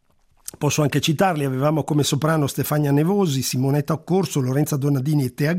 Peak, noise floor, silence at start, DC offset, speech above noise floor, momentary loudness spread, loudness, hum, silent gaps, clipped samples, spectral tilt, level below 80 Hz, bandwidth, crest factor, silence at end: -6 dBFS; -42 dBFS; 0.6 s; under 0.1%; 22 dB; 3 LU; -21 LUFS; none; none; under 0.1%; -5.5 dB/octave; -56 dBFS; 16 kHz; 16 dB; 0 s